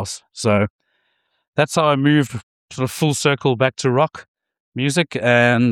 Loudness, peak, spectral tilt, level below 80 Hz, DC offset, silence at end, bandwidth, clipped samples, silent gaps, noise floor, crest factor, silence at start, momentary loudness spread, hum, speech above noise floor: -18 LUFS; -2 dBFS; -5 dB/octave; -58 dBFS; under 0.1%; 0 s; 17 kHz; under 0.1%; 0.70-0.79 s, 1.48-1.53 s, 2.43-2.68 s, 4.28-4.35 s, 4.60-4.72 s; -68 dBFS; 18 dB; 0 s; 11 LU; none; 51 dB